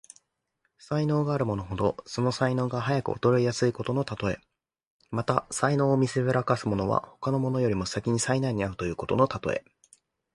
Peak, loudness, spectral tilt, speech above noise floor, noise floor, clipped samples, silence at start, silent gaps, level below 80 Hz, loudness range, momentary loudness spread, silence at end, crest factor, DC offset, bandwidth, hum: -4 dBFS; -27 LUFS; -6 dB/octave; 51 dB; -77 dBFS; under 0.1%; 0.9 s; 4.87-5.00 s; -52 dBFS; 2 LU; 7 LU; 0.75 s; 22 dB; under 0.1%; 11.5 kHz; none